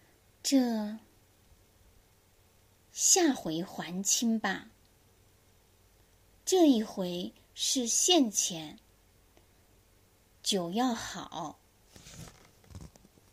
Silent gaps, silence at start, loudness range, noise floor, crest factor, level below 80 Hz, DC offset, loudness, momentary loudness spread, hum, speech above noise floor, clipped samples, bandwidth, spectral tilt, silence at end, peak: none; 0.45 s; 8 LU; -64 dBFS; 22 dB; -66 dBFS; under 0.1%; -29 LUFS; 24 LU; none; 35 dB; under 0.1%; 15.5 kHz; -2.5 dB/octave; 0.45 s; -12 dBFS